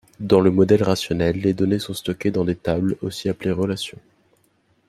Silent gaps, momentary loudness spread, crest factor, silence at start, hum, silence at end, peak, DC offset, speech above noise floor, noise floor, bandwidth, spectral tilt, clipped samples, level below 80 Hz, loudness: none; 9 LU; 20 dB; 0.2 s; none; 0.95 s; -2 dBFS; under 0.1%; 43 dB; -63 dBFS; 14 kHz; -6.5 dB/octave; under 0.1%; -50 dBFS; -21 LUFS